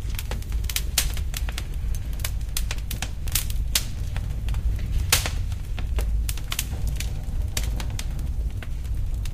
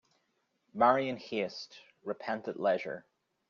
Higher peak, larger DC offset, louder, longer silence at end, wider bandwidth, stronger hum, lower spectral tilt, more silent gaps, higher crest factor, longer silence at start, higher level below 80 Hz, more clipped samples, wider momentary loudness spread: first, -4 dBFS vs -10 dBFS; neither; first, -28 LUFS vs -32 LUFS; second, 0 s vs 0.5 s; first, 16 kHz vs 7.2 kHz; neither; about the same, -3 dB/octave vs -3 dB/octave; neither; about the same, 22 dB vs 24 dB; second, 0 s vs 0.75 s; first, -28 dBFS vs -76 dBFS; neither; second, 7 LU vs 19 LU